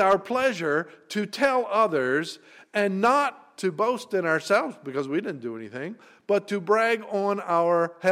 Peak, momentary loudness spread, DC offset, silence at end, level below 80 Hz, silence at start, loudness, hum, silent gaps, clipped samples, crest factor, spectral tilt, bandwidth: -8 dBFS; 13 LU; under 0.1%; 0 s; -70 dBFS; 0 s; -25 LUFS; none; none; under 0.1%; 16 dB; -5 dB/octave; 15.5 kHz